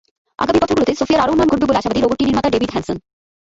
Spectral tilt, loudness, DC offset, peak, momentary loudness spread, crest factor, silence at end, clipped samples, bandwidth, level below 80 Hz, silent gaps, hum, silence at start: -5.5 dB/octave; -16 LUFS; under 0.1%; -2 dBFS; 8 LU; 14 dB; 0.6 s; under 0.1%; 8 kHz; -40 dBFS; none; none; 0.4 s